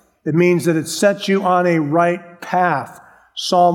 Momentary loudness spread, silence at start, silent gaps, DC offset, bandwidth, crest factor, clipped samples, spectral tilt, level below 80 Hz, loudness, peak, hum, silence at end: 10 LU; 0.25 s; none; under 0.1%; 17 kHz; 16 dB; under 0.1%; -5.5 dB/octave; -68 dBFS; -17 LUFS; -2 dBFS; none; 0 s